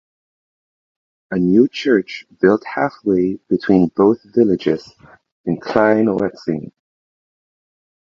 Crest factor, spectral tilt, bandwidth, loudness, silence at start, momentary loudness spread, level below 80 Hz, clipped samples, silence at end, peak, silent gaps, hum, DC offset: 18 dB; -8 dB/octave; 7.2 kHz; -17 LUFS; 1.3 s; 10 LU; -54 dBFS; under 0.1%; 1.45 s; 0 dBFS; 5.32-5.44 s; none; under 0.1%